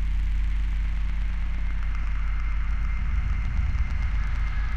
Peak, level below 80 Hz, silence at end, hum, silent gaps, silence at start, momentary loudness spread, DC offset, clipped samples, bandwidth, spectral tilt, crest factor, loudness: -14 dBFS; -24 dBFS; 0 s; none; none; 0 s; 3 LU; under 0.1%; under 0.1%; 6.2 kHz; -6.5 dB/octave; 10 dB; -30 LUFS